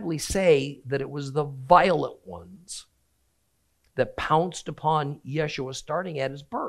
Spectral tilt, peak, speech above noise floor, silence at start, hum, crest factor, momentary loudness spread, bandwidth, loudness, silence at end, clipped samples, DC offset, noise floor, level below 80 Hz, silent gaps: -5 dB/octave; -4 dBFS; 46 dB; 0 s; none; 24 dB; 19 LU; 13.5 kHz; -25 LUFS; 0 s; under 0.1%; under 0.1%; -71 dBFS; -52 dBFS; none